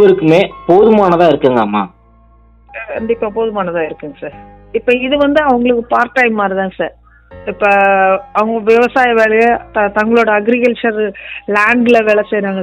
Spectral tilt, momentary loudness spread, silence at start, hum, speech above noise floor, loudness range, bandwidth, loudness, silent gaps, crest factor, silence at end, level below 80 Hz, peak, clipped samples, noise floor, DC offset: -6.5 dB/octave; 13 LU; 0 s; none; 33 dB; 6 LU; 9.2 kHz; -12 LUFS; none; 12 dB; 0 s; -44 dBFS; 0 dBFS; 0.5%; -45 dBFS; under 0.1%